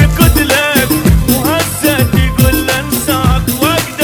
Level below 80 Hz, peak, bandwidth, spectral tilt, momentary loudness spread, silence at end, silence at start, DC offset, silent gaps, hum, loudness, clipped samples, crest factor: -18 dBFS; 0 dBFS; 19.5 kHz; -4.5 dB/octave; 4 LU; 0 s; 0 s; under 0.1%; none; none; -11 LUFS; 0.3%; 10 dB